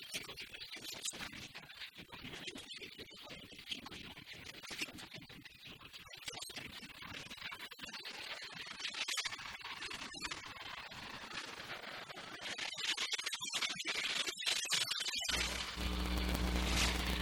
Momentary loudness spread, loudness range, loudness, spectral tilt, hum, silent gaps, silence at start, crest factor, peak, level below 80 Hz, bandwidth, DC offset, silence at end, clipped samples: 15 LU; 11 LU; -41 LUFS; -2 dB/octave; none; none; 0 s; 26 dB; -16 dBFS; -50 dBFS; 19 kHz; under 0.1%; 0 s; under 0.1%